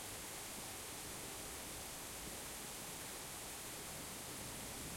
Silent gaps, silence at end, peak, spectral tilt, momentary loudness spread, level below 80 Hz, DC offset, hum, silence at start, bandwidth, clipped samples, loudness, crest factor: none; 0 s; -36 dBFS; -2 dB/octave; 0 LU; -64 dBFS; under 0.1%; none; 0 s; 16.5 kHz; under 0.1%; -46 LUFS; 14 dB